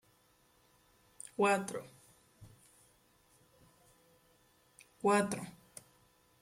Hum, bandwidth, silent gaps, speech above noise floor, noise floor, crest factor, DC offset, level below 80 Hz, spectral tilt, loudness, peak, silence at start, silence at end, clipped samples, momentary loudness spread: none; 16.5 kHz; none; 37 dB; -70 dBFS; 22 dB; under 0.1%; -76 dBFS; -4.5 dB/octave; -34 LUFS; -18 dBFS; 1.4 s; 0.9 s; under 0.1%; 24 LU